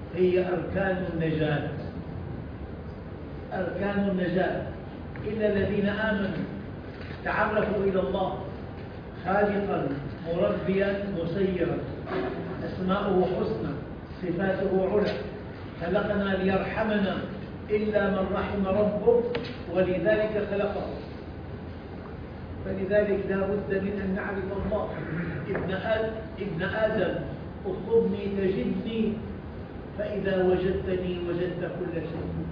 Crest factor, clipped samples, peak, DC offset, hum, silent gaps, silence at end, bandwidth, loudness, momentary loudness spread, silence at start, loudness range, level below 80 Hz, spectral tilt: 18 dB; under 0.1%; -10 dBFS; under 0.1%; none; none; 0 s; 5.2 kHz; -28 LUFS; 14 LU; 0 s; 4 LU; -46 dBFS; -9.5 dB/octave